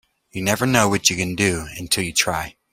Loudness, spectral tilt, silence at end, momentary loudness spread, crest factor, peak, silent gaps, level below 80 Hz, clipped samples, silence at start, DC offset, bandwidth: -20 LUFS; -3 dB/octave; 0.2 s; 10 LU; 20 dB; 0 dBFS; none; -46 dBFS; under 0.1%; 0.35 s; under 0.1%; 16.5 kHz